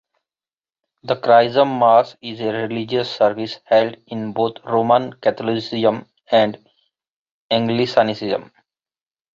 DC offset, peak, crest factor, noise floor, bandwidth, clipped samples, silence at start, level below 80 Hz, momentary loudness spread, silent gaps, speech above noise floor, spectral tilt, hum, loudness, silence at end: under 0.1%; -2 dBFS; 18 dB; under -90 dBFS; 7.4 kHz; under 0.1%; 1.05 s; -64 dBFS; 12 LU; 7.09-7.50 s; over 72 dB; -6.5 dB/octave; none; -18 LUFS; 0.9 s